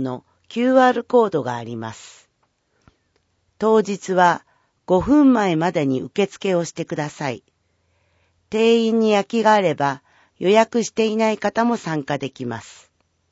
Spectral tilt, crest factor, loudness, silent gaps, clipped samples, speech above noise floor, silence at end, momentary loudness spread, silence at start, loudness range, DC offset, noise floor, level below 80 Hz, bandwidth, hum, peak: -5.5 dB/octave; 18 dB; -19 LUFS; none; under 0.1%; 49 dB; 0.6 s; 14 LU; 0 s; 5 LU; under 0.1%; -68 dBFS; -54 dBFS; 8 kHz; none; -2 dBFS